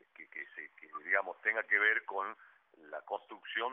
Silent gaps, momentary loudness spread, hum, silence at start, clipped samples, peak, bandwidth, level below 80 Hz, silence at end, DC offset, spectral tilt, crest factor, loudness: none; 20 LU; none; 0.2 s; under 0.1%; -14 dBFS; 3.9 kHz; under -90 dBFS; 0 s; under 0.1%; 8 dB/octave; 22 dB; -34 LUFS